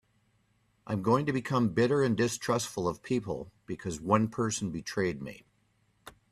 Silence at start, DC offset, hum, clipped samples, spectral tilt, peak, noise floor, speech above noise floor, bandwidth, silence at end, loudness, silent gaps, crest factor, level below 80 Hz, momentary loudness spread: 0.85 s; under 0.1%; none; under 0.1%; -5.5 dB/octave; -10 dBFS; -71 dBFS; 41 dB; 14.5 kHz; 0.2 s; -30 LUFS; none; 22 dB; -62 dBFS; 12 LU